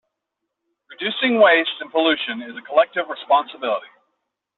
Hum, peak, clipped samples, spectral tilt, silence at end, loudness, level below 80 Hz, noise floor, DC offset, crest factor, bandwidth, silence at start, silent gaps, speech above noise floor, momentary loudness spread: none; -2 dBFS; under 0.1%; 0.5 dB/octave; 0.7 s; -19 LUFS; -70 dBFS; -80 dBFS; under 0.1%; 18 dB; 4.3 kHz; 0.9 s; none; 61 dB; 13 LU